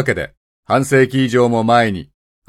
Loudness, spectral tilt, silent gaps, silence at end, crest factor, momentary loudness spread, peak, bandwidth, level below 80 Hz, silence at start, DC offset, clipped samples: -15 LUFS; -6 dB/octave; 0.37-0.63 s; 0.45 s; 16 dB; 11 LU; 0 dBFS; 14 kHz; -48 dBFS; 0 s; under 0.1%; under 0.1%